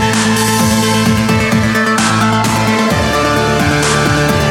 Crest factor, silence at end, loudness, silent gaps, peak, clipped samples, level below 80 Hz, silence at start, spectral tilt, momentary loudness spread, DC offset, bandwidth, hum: 12 dB; 0 s; -11 LUFS; none; 0 dBFS; under 0.1%; -30 dBFS; 0 s; -4.5 dB/octave; 1 LU; under 0.1%; 17 kHz; none